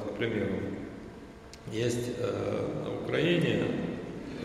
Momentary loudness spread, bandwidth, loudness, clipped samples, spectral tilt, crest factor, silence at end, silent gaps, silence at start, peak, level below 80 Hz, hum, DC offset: 18 LU; 14 kHz; -32 LUFS; under 0.1%; -6 dB/octave; 18 dB; 0 s; none; 0 s; -14 dBFS; -56 dBFS; none; under 0.1%